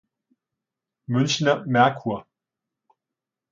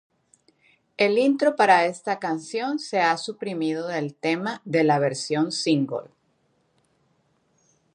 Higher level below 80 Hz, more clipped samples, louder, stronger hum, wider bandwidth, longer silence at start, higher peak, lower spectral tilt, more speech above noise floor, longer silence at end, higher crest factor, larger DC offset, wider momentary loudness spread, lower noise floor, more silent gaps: first, -68 dBFS vs -78 dBFS; neither; about the same, -22 LUFS vs -23 LUFS; neither; second, 7.6 kHz vs 10.5 kHz; about the same, 1.1 s vs 1 s; about the same, -4 dBFS vs -4 dBFS; about the same, -5 dB/octave vs -5 dB/octave; first, 66 dB vs 45 dB; second, 1.3 s vs 1.9 s; about the same, 22 dB vs 20 dB; neither; about the same, 11 LU vs 9 LU; first, -87 dBFS vs -68 dBFS; neither